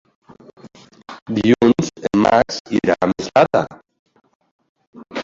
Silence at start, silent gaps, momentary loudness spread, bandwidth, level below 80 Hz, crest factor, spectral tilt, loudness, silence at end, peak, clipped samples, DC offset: 0.65 s; 1.22-1.26 s, 2.60-2.65 s, 3.99-4.06 s, 4.35-4.40 s, 4.51-4.59 s, 4.69-4.75 s, 4.87-4.93 s; 16 LU; 7.6 kHz; -50 dBFS; 18 dB; -6 dB/octave; -17 LUFS; 0 s; -2 dBFS; under 0.1%; under 0.1%